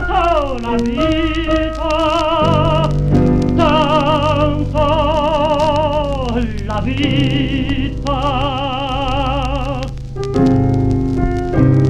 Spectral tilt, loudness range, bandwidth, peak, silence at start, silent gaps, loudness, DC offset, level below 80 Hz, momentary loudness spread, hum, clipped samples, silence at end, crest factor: -7 dB/octave; 4 LU; 10 kHz; 0 dBFS; 0 s; none; -16 LUFS; under 0.1%; -24 dBFS; 6 LU; none; under 0.1%; 0 s; 14 dB